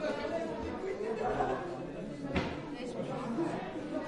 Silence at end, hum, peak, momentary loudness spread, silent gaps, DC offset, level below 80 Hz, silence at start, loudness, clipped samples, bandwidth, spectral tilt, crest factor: 0 s; none; -18 dBFS; 7 LU; none; under 0.1%; -56 dBFS; 0 s; -37 LUFS; under 0.1%; 11.5 kHz; -6.5 dB/octave; 18 dB